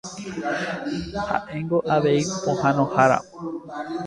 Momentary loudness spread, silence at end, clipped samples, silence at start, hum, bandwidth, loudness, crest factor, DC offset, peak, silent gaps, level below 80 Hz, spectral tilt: 14 LU; 0 s; under 0.1%; 0.05 s; none; 11 kHz; -23 LUFS; 20 dB; under 0.1%; -4 dBFS; none; -52 dBFS; -5.5 dB/octave